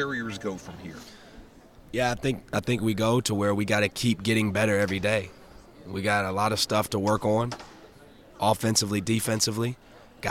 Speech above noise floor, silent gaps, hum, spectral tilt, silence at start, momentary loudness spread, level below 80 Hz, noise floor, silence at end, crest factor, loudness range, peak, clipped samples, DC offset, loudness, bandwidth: 25 dB; none; none; -4.5 dB/octave; 0 s; 14 LU; -54 dBFS; -51 dBFS; 0 s; 18 dB; 3 LU; -8 dBFS; under 0.1%; under 0.1%; -26 LUFS; 16.5 kHz